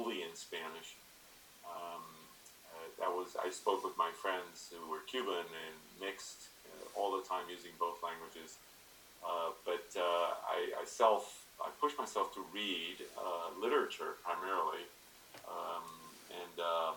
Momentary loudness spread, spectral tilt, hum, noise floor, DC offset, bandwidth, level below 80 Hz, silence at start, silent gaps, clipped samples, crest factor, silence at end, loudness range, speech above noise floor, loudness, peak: 18 LU; -2 dB/octave; none; -61 dBFS; under 0.1%; 19 kHz; -78 dBFS; 0 s; none; under 0.1%; 24 dB; 0 s; 6 LU; 21 dB; -40 LUFS; -18 dBFS